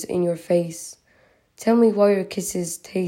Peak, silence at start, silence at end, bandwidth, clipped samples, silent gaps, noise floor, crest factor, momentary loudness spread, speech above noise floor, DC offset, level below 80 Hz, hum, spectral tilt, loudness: -6 dBFS; 0 s; 0 s; 16.5 kHz; under 0.1%; none; -59 dBFS; 16 dB; 13 LU; 38 dB; under 0.1%; -62 dBFS; none; -5.5 dB/octave; -21 LUFS